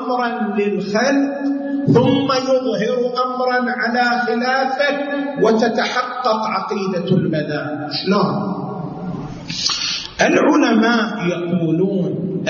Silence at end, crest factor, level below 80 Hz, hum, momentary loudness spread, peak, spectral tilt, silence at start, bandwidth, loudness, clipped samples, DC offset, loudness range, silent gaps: 0 s; 14 dB; -54 dBFS; none; 8 LU; -4 dBFS; -5.5 dB/octave; 0 s; 7.4 kHz; -18 LUFS; under 0.1%; under 0.1%; 3 LU; none